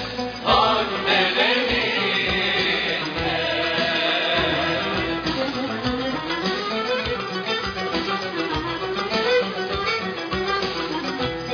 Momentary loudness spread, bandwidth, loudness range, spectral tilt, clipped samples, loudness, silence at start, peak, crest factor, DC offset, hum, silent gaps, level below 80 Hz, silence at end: 7 LU; 5.4 kHz; 5 LU; -4.5 dB/octave; under 0.1%; -22 LUFS; 0 s; -6 dBFS; 18 dB; under 0.1%; none; none; -44 dBFS; 0 s